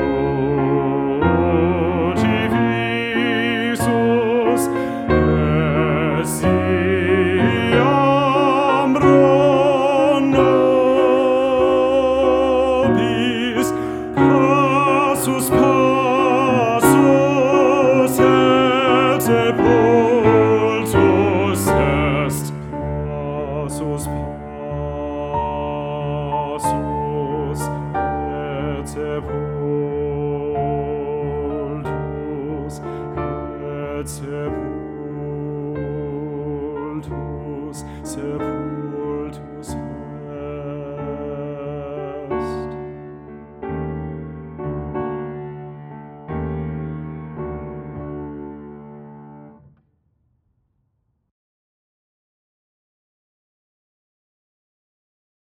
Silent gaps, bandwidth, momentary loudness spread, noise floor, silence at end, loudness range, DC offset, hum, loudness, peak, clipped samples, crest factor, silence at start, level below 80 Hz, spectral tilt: none; 18 kHz; 16 LU; -69 dBFS; 6 s; 14 LU; under 0.1%; none; -18 LUFS; 0 dBFS; under 0.1%; 18 dB; 0 s; -38 dBFS; -6 dB/octave